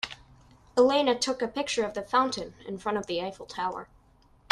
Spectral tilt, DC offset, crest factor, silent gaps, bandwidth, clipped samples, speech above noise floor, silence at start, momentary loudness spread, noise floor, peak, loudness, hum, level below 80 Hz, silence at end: -3 dB/octave; under 0.1%; 22 dB; none; 12 kHz; under 0.1%; 32 dB; 0.05 s; 14 LU; -60 dBFS; -6 dBFS; -28 LUFS; none; -60 dBFS; 0.7 s